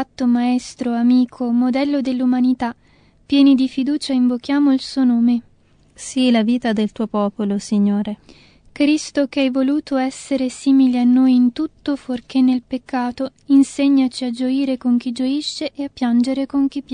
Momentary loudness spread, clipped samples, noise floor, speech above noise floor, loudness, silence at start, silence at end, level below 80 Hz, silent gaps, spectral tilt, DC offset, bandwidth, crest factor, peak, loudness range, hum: 9 LU; under 0.1%; -53 dBFS; 36 dB; -18 LUFS; 0 s; 0 s; -56 dBFS; none; -5.5 dB/octave; under 0.1%; 10 kHz; 14 dB; -2 dBFS; 3 LU; none